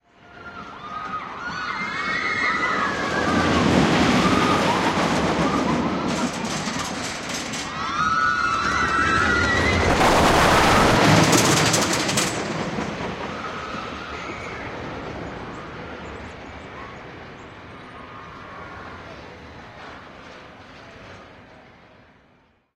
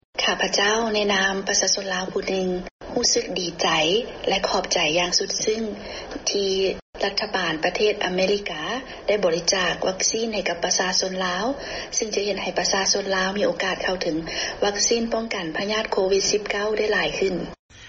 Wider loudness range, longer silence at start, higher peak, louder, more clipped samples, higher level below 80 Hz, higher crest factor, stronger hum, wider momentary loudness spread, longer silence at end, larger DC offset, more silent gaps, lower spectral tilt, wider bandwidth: first, 22 LU vs 2 LU; first, 0.3 s vs 0.15 s; first, -2 dBFS vs -6 dBFS; about the same, -20 LUFS vs -22 LUFS; neither; first, -40 dBFS vs -50 dBFS; about the same, 20 dB vs 18 dB; neither; first, 24 LU vs 7 LU; first, 1.15 s vs 0 s; neither; second, none vs 2.71-2.79 s, 6.82-6.93 s, 17.59-17.69 s; first, -4 dB/octave vs -1.5 dB/octave; first, 16 kHz vs 7.4 kHz